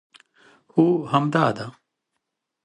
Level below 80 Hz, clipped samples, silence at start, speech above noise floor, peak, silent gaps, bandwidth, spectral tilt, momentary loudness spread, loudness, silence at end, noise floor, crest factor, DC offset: -68 dBFS; under 0.1%; 0.75 s; 60 dB; -4 dBFS; none; 10 kHz; -7.5 dB/octave; 13 LU; -21 LUFS; 0.95 s; -80 dBFS; 20 dB; under 0.1%